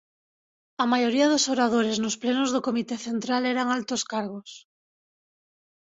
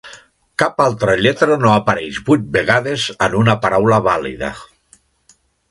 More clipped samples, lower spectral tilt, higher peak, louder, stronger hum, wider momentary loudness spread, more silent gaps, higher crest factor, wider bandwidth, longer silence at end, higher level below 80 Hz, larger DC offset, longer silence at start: neither; second, -3 dB/octave vs -5.5 dB/octave; second, -10 dBFS vs 0 dBFS; second, -25 LUFS vs -15 LUFS; neither; about the same, 10 LU vs 10 LU; neither; about the same, 16 dB vs 16 dB; second, 8 kHz vs 11.5 kHz; first, 1.25 s vs 1.05 s; second, -70 dBFS vs -46 dBFS; neither; first, 0.8 s vs 0.05 s